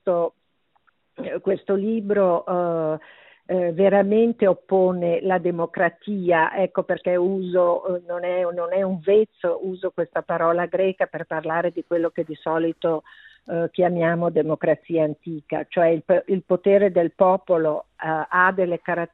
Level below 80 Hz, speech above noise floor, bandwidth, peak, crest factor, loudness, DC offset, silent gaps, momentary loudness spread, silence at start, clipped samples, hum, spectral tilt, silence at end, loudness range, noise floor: -66 dBFS; 44 dB; 4.1 kHz; -4 dBFS; 18 dB; -22 LUFS; under 0.1%; none; 9 LU; 0.05 s; under 0.1%; none; -10.5 dB/octave; 0.05 s; 4 LU; -65 dBFS